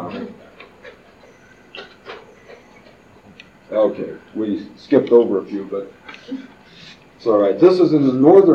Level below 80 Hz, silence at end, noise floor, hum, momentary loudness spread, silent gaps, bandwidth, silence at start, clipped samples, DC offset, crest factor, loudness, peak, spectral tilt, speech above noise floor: -62 dBFS; 0 s; -47 dBFS; none; 24 LU; none; 7 kHz; 0 s; under 0.1%; under 0.1%; 18 dB; -16 LUFS; 0 dBFS; -8.5 dB/octave; 32 dB